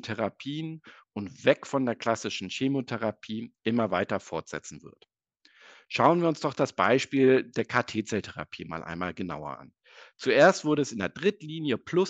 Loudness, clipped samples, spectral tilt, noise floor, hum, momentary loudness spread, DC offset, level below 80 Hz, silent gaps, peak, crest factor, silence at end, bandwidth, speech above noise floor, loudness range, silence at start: -27 LUFS; under 0.1%; -5.5 dB/octave; -64 dBFS; none; 16 LU; under 0.1%; -68 dBFS; none; -6 dBFS; 22 dB; 0 s; 8.6 kHz; 36 dB; 5 LU; 0.05 s